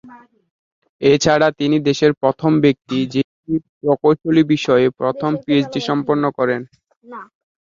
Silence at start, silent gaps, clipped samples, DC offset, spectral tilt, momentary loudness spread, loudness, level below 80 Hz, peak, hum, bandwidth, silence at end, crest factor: 0.05 s; 0.51-0.82 s, 0.89-0.99 s, 3.24-3.43 s, 3.69-3.81 s, 6.96-7.01 s; under 0.1%; under 0.1%; -6 dB/octave; 9 LU; -17 LUFS; -56 dBFS; -2 dBFS; none; 7.6 kHz; 0.4 s; 16 dB